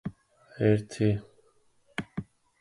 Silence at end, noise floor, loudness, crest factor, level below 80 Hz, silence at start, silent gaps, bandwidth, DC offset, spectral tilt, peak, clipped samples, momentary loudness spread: 0.4 s; -65 dBFS; -29 LUFS; 20 dB; -56 dBFS; 0.05 s; none; 11.5 kHz; under 0.1%; -7.5 dB/octave; -10 dBFS; under 0.1%; 15 LU